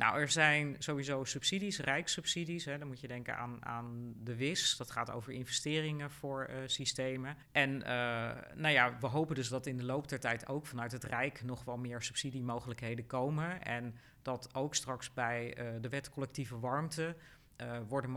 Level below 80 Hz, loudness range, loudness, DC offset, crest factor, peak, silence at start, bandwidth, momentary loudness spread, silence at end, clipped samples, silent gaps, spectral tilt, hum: -68 dBFS; 5 LU; -37 LUFS; under 0.1%; 24 dB; -14 dBFS; 0 s; over 20 kHz; 11 LU; 0 s; under 0.1%; none; -3.5 dB/octave; none